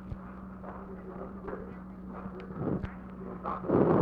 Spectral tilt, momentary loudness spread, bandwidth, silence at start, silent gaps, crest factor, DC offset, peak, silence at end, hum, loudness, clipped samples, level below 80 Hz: -11 dB/octave; 15 LU; 5 kHz; 0 s; none; 22 dB; under 0.1%; -12 dBFS; 0 s; none; -36 LUFS; under 0.1%; -52 dBFS